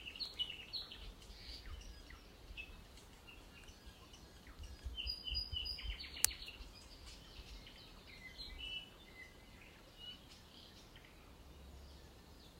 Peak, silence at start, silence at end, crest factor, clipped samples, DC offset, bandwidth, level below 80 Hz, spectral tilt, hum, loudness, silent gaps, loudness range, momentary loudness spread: -4 dBFS; 0 s; 0 s; 46 dB; under 0.1%; under 0.1%; 16 kHz; -56 dBFS; -1 dB/octave; none; -46 LUFS; none; 13 LU; 18 LU